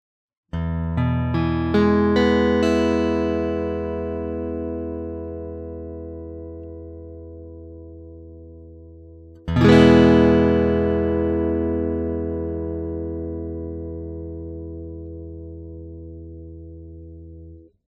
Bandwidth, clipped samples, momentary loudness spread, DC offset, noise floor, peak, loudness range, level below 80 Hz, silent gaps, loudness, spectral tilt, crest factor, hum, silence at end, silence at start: 9.8 kHz; under 0.1%; 24 LU; under 0.1%; -43 dBFS; 0 dBFS; 20 LU; -36 dBFS; none; -20 LUFS; -8 dB/octave; 22 dB; none; 0.25 s; 0.55 s